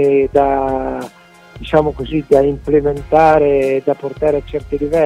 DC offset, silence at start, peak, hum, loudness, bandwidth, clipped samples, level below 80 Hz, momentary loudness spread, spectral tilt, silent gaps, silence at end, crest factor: under 0.1%; 0 s; 0 dBFS; none; -15 LUFS; 11.5 kHz; under 0.1%; -34 dBFS; 11 LU; -7.5 dB/octave; none; 0 s; 14 dB